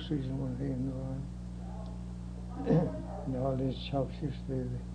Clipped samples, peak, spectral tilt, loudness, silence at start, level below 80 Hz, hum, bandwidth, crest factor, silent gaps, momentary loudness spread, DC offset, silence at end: under 0.1%; -16 dBFS; -8.5 dB/octave; -36 LUFS; 0 s; -44 dBFS; 60 Hz at -40 dBFS; 9.8 kHz; 18 dB; none; 12 LU; under 0.1%; 0 s